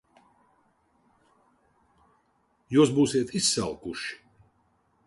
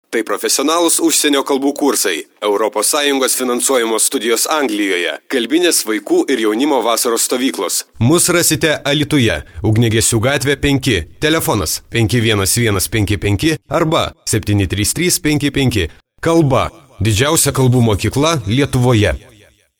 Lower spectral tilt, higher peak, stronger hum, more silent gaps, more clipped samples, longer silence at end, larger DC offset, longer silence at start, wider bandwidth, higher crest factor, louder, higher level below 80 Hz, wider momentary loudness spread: about the same, -4 dB/octave vs -4 dB/octave; second, -10 dBFS vs 0 dBFS; neither; neither; neither; first, 0.9 s vs 0.6 s; neither; first, 2.7 s vs 0.1 s; second, 11.5 kHz vs over 20 kHz; first, 20 dB vs 14 dB; second, -25 LUFS vs -14 LUFS; second, -62 dBFS vs -36 dBFS; first, 14 LU vs 6 LU